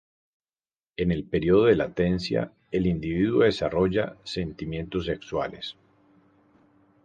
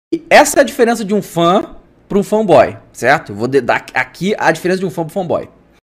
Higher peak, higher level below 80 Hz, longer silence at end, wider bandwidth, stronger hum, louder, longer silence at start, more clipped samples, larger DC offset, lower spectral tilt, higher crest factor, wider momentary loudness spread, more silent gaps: second, -8 dBFS vs 0 dBFS; about the same, -46 dBFS vs -46 dBFS; first, 1.3 s vs 0.45 s; second, 9.2 kHz vs 16 kHz; neither; second, -26 LUFS vs -13 LUFS; first, 1 s vs 0.1 s; neither; neither; first, -7.5 dB/octave vs -4.5 dB/octave; first, 20 dB vs 14 dB; about the same, 11 LU vs 9 LU; neither